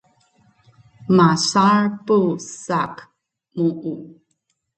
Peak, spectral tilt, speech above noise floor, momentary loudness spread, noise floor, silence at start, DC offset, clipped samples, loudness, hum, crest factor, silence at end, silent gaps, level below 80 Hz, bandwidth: -2 dBFS; -5.5 dB/octave; 53 dB; 20 LU; -71 dBFS; 1.1 s; under 0.1%; under 0.1%; -18 LUFS; none; 18 dB; 0.7 s; none; -62 dBFS; 9 kHz